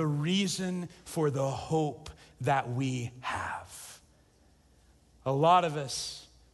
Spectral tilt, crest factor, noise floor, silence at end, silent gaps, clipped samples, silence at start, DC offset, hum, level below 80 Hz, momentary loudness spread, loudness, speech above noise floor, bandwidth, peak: -5 dB/octave; 20 dB; -63 dBFS; 0.3 s; none; under 0.1%; 0 s; under 0.1%; none; -60 dBFS; 20 LU; -31 LUFS; 33 dB; 12.5 kHz; -12 dBFS